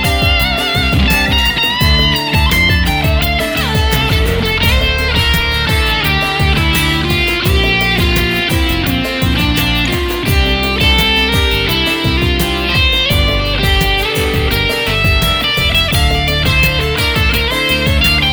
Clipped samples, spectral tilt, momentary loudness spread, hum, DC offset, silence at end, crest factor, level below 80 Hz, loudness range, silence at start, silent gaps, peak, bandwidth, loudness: under 0.1%; -4.5 dB/octave; 3 LU; none; under 0.1%; 0 s; 12 dB; -18 dBFS; 1 LU; 0 s; none; 0 dBFS; over 20 kHz; -12 LUFS